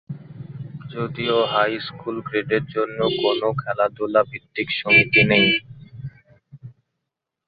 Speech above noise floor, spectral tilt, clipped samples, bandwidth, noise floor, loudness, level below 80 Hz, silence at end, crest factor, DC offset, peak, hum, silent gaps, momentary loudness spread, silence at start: 62 dB; -9 dB/octave; under 0.1%; 5 kHz; -82 dBFS; -20 LUFS; -56 dBFS; 0.75 s; 20 dB; under 0.1%; -2 dBFS; none; none; 22 LU; 0.1 s